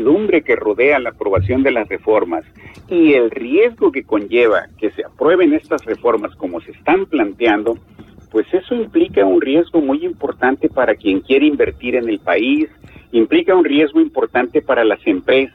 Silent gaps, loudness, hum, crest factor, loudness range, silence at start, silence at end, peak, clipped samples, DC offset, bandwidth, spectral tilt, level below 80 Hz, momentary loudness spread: none; -15 LUFS; none; 12 dB; 2 LU; 0 s; 0.05 s; -4 dBFS; under 0.1%; under 0.1%; 4.2 kHz; -7.5 dB/octave; -46 dBFS; 8 LU